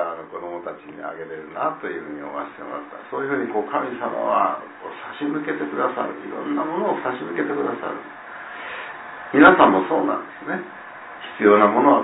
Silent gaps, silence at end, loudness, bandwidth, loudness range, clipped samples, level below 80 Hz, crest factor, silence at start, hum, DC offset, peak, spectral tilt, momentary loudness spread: none; 0 s; -21 LUFS; 4 kHz; 9 LU; under 0.1%; -62 dBFS; 22 dB; 0 s; none; under 0.1%; 0 dBFS; -9.5 dB/octave; 20 LU